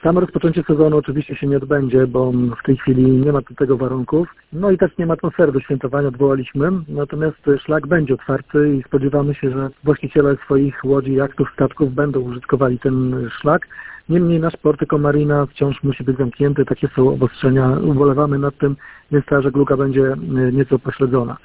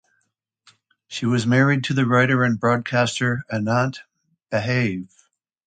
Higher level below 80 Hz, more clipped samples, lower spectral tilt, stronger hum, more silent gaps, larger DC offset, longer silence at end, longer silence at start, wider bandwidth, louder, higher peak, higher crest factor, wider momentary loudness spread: first, -42 dBFS vs -60 dBFS; neither; first, -12.5 dB/octave vs -6 dB/octave; neither; neither; neither; second, 0.05 s vs 0.6 s; second, 0.05 s vs 1.1 s; second, 4 kHz vs 9.4 kHz; first, -17 LUFS vs -20 LUFS; first, 0 dBFS vs -6 dBFS; about the same, 16 dB vs 16 dB; second, 6 LU vs 9 LU